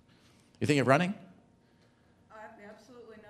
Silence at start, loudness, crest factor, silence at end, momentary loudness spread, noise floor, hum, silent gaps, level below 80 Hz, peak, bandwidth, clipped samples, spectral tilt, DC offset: 0.6 s; -28 LUFS; 26 dB; 0.15 s; 27 LU; -65 dBFS; none; none; -74 dBFS; -8 dBFS; 14 kHz; under 0.1%; -6 dB/octave; under 0.1%